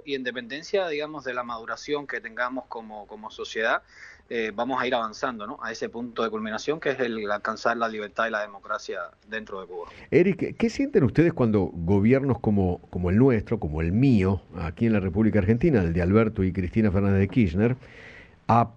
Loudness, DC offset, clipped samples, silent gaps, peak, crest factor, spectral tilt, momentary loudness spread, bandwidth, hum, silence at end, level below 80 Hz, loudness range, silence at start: -25 LUFS; under 0.1%; under 0.1%; none; -6 dBFS; 18 dB; -7.5 dB/octave; 13 LU; 7.8 kHz; none; 0.05 s; -46 dBFS; 7 LU; 0.05 s